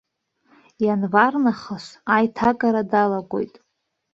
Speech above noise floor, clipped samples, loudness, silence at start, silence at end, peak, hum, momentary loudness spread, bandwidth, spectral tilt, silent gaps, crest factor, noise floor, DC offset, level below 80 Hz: 44 dB; under 0.1%; -20 LUFS; 0.8 s; 0.65 s; -2 dBFS; none; 13 LU; 7.8 kHz; -7 dB/octave; none; 20 dB; -64 dBFS; under 0.1%; -60 dBFS